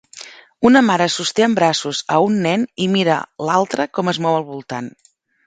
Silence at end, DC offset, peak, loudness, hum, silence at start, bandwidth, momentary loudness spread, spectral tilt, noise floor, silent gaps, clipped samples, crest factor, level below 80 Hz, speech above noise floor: 0.55 s; under 0.1%; 0 dBFS; -17 LUFS; none; 0.15 s; 9.4 kHz; 15 LU; -4.5 dB/octave; -39 dBFS; none; under 0.1%; 18 dB; -60 dBFS; 23 dB